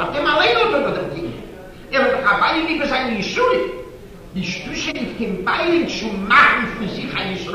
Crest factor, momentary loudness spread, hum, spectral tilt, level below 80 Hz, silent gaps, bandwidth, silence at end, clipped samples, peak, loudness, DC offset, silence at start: 16 dB; 14 LU; none; -4.5 dB/octave; -42 dBFS; none; 15 kHz; 0 s; under 0.1%; -4 dBFS; -18 LUFS; under 0.1%; 0 s